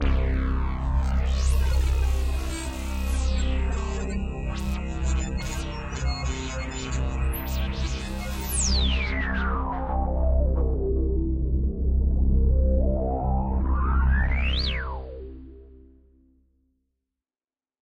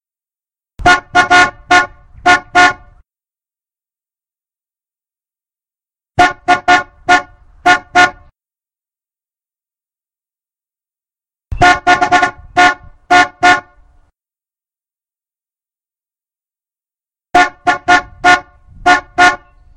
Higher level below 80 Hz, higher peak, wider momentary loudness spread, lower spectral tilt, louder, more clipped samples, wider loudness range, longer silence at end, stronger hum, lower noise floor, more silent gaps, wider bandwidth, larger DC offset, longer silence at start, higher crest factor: first, -26 dBFS vs -38 dBFS; second, -12 dBFS vs 0 dBFS; about the same, 8 LU vs 7 LU; first, -5 dB/octave vs -2.5 dB/octave; second, -27 LUFS vs -11 LUFS; neither; second, 5 LU vs 8 LU; first, 2.1 s vs 0.4 s; neither; about the same, under -90 dBFS vs under -90 dBFS; neither; first, 16 kHz vs 11 kHz; neither; second, 0 s vs 0.8 s; about the same, 14 dB vs 14 dB